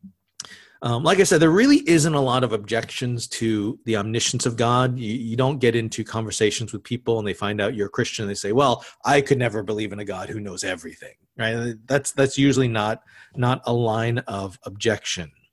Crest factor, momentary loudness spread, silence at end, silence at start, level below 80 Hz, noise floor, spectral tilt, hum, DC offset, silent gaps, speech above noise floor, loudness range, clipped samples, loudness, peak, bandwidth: 18 dB; 14 LU; 0.25 s; 0.05 s; -52 dBFS; -42 dBFS; -5 dB/octave; none; under 0.1%; none; 20 dB; 4 LU; under 0.1%; -22 LUFS; -4 dBFS; 12.5 kHz